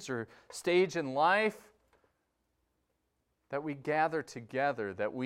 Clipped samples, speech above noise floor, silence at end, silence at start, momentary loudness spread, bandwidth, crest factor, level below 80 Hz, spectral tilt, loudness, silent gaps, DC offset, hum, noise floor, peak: under 0.1%; 48 dB; 0 s; 0 s; 12 LU; 15 kHz; 20 dB; -78 dBFS; -5 dB/octave; -32 LUFS; none; under 0.1%; none; -80 dBFS; -14 dBFS